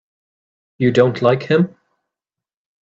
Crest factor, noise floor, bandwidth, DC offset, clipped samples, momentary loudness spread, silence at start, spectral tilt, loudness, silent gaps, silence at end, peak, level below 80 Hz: 20 dB; -87 dBFS; 7.8 kHz; under 0.1%; under 0.1%; 5 LU; 0.8 s; -7.5 dB/octave; -16 LUFS; none; 1.15 s; 0 dBFS; -60 dBFS